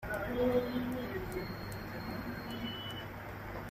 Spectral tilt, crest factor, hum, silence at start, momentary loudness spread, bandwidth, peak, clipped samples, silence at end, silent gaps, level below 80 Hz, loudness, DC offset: -6 dB/octave; 18 dB; none; 0 s; 12 LU; 15.5 kHz; -20 dBFS; under 0.1%; 0 s; none; -52 dBFS; -38 LUFS; under 0.1%